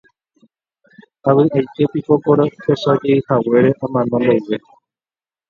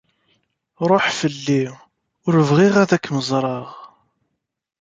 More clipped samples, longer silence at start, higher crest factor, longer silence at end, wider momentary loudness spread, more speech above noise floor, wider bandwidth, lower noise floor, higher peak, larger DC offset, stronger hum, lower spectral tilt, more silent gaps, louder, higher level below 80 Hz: neither; first, 1.25 s vs 0.8 s; about the same, 16 dB vs 18 dB; about the same, 0.9 s vs 0.95 s; second, 6 LU vs 14 LU; first, over 75 dB vs 58 dB; second, 7 kHz vs 9.2 kHz; first, under -90 dBFS vs -76 dBFS; about the same, 0 dBFS vs -2 dBFS; neither; neither; first, -9 dB/octave vs -6 dB/octave; neither; about the same, -16 LUFS vs -18 LUFS; about the same, -58 dBFS vs -60 dBFS